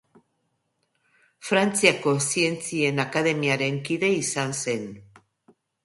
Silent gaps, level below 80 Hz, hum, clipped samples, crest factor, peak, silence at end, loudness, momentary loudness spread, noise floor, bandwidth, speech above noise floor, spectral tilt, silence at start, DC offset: none; -68 dBFS; none; under 0.1%; 24 dB; -2 dBFS; 0.8 s; -23 LUFS; 9 LU; -74 dBFS; 12 kHz; 50 dB; -3.5 dB/octave; 1.4 s; under 0.1%